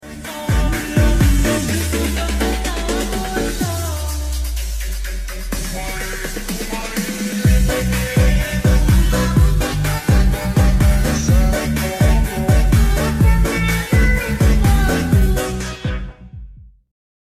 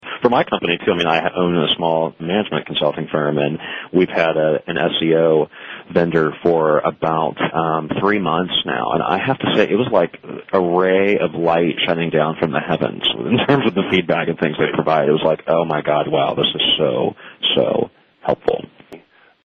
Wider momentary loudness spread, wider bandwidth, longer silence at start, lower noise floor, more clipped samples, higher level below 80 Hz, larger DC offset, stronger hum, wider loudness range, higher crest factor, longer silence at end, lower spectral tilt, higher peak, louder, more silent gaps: first, 10 LU vs 5 LU; first, 15.5 kHz vs 6.8 kHz; about the same, 0.05 s vs 0.05 s; second, -38 dBFS vs -46 dBFS; neither; first, -18 dBFS vs -54 dBFS; first, 0.5% vs under 0.1%; neither; first, 7 LU vs 1 LU; about the same, 12 dB vs 16 dB; about the same, 0.55 s vs 0.45 s; second, -5.5 dB/octave vs -7.5 dB/octave; about the same, -4 dBFS vs -2 dBFS; about the same, -18 LUFS vs -18 LUFS; neither